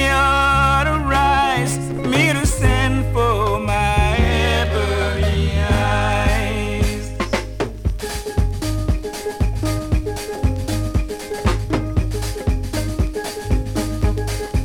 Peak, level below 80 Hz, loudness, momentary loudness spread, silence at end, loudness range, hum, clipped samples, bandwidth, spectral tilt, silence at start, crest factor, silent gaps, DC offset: -2 dBFS; -24 dBFS; -19 LUFS; 8 LU; 0 s; 6 LU; none; under 0.1%; 18.5 kHz; -5 dB/octave; 0 s; 16 dB; none; under 0.1%